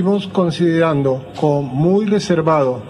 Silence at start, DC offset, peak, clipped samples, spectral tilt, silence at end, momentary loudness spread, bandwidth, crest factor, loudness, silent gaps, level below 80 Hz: 0 s; under 0.1%; -2 dBFS; under 0.1%; -7.5 dB/octave; 0 s; 4 LU; 11 kHz; 14 dB; -16 LUFS; none; -50 dBFS